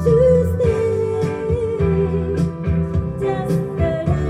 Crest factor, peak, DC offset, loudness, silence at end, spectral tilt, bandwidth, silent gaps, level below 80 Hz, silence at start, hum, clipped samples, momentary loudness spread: 14 dB; -4 dBFS; under 0.1%; -19 LUFS; 0 s; -9 dB/octave; 12.5 kHz; none; -32 dBFS; 0 s; none; under 0.1%; 7 LU